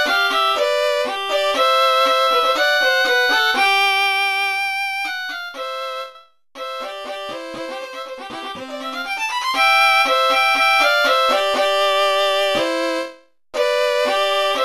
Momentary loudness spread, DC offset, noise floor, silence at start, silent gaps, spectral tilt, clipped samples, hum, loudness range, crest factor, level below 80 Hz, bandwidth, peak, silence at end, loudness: 15 LU; under 0.1%; -44 dBFS; 0 s; none; 0 dB/octave; under 0.1%; none; 13 LU; 16 dB; -62 dBFS; 14 kHz; -2 dBFS; 0 s; -16 LUFS